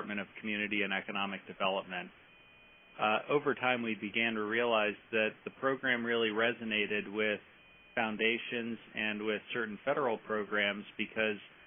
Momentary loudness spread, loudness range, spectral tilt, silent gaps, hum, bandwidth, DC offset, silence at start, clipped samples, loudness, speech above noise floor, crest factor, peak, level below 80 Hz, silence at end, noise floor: 8 LU; 3 LU; 0 dB/octave; none; none; 3.7 kHz; under 0.1%; 0 s; under 0.1%; -34 LUFS; 26 dB; 20 dB; -14 dBFS; -78 dBFS; 0 s; -60 dBFS